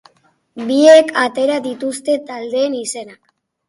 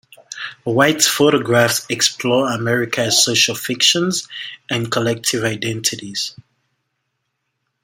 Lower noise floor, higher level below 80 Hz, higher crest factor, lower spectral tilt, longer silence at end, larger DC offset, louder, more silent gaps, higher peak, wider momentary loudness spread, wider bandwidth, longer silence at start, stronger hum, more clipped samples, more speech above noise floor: second, -57 dBFS vs -73 dBFS; second, -68 dBFS vs -60 dBFS; about the same, 16 dB vs 18 dB; about the same, -2.5 dB/octave vs -2.5 dB/octave; second, 0.55 s vs 1.5 s; neither; about the same, -14 LUFS vs -16 LUFS; neither; about the same, 0 dBFS vs 0 dBFS; first, 16 LU vs 13 LU; second, 11.5 kHz vs 16.5 kHz; first, 0.55 s vs 0.3 s; neither; neither; second, 42 dB vs 56 dB